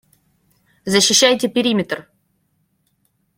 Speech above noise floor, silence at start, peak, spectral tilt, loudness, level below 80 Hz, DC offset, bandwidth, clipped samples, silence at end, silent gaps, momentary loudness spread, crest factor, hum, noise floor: 50 dB; 0.85 s; 0 dBFS; -2.5 dB/octave; -15 LUFS; -60 dBFS; under 0.1%; 16.5 kHz; under 0.1%; 1.35 s; none; 16 LU; 20 dB; none; -66 dBFS